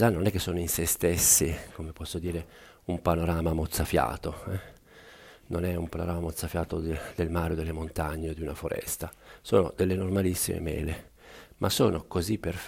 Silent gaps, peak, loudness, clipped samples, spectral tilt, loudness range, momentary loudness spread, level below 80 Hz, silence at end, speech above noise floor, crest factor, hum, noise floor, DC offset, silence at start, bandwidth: none; -8 dBFS; -29 LUFS; under 0.1%; -4.5 dB/octave; 6 LU; 12 LU; -42 dBFS; 0 s; 24 dB; 22 dB; none; -52 dBFS; under 0.1%; 0 s; 16 kHz